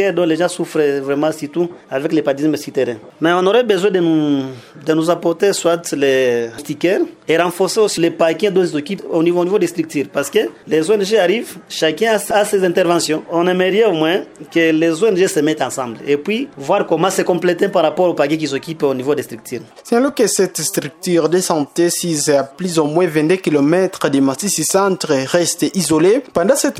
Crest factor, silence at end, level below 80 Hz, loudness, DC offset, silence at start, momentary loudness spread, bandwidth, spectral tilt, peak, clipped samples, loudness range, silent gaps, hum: 16 dB; 0 s; -60 dBFS; -16 LUFS; under 0.1%; 0 s; 7 LU; 16 kHz; -4.5 dB/octave; 0 dBFS; under 0.1%; 2 LU; none; none